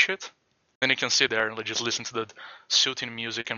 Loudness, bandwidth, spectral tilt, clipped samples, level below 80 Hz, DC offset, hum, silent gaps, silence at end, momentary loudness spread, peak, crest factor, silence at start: -25 LUFS; 8.2 kHz; -1 dB/octave; under 0.1%; -72 dBFS; under 0.1%; none; 0.75-0.81 s; 0 s; 13 LU; -6 dBFS; 22 dB; 0 s